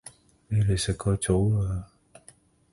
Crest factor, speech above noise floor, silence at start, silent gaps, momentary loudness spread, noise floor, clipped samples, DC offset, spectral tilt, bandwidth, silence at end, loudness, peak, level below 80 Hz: 18 dB; 32 dB; 0.05 s; none; 10 LU; -57 dBFS; under 0.1%; under 0.1%; -6 dB/octave; 11.5 kHz; 0.9 s; -26 LUFS; -10 dBFS; -40 dBFS